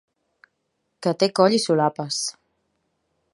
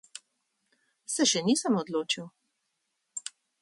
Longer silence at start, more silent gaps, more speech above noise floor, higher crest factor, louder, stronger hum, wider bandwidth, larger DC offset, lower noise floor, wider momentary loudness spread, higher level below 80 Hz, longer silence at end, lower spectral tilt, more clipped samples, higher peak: first, 1 s vs 0.15 s; neither; about the same, 54 dB vs 52 dB; about the same, 22 dB vs 20 dB; first, -21 LUFS vs -28 LUFS; neither; about the same, 11.5 kHz vs 11.5 kHz; neither; second, -75 dBFS vs -80 dBFS; second, 10 LU vs 23 LU; about the same, -76 dBFS vs -76 dBFS; first, 1.05 s vs 0.35 s; first, -4.5 dB/octave vs -3 dB/octave; neither; first, -2 dBFS vs -12 dBFS